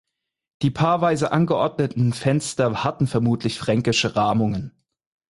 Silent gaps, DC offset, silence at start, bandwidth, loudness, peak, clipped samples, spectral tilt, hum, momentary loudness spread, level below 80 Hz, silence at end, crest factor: none; under 0.1%; 0.6 s; 11.5 kHz; -21 LUFS; -6 dBFS; under 0.1%; -6 dB/octave; none; 5 LU; -52 dBFS; 0.65 s; 16 dB